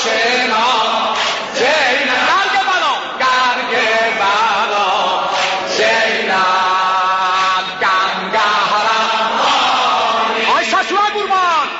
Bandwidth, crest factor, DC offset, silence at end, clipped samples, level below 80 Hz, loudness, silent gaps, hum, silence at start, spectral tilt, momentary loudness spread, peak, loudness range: 8 kHz; 12 dB; under 0.1%; 0 s; under 0.1%; -56 dBFS; -13 LUFS; none; none; 0 s; -1.5 dB/octave; 3 LU; -4 dBFS; 0 LU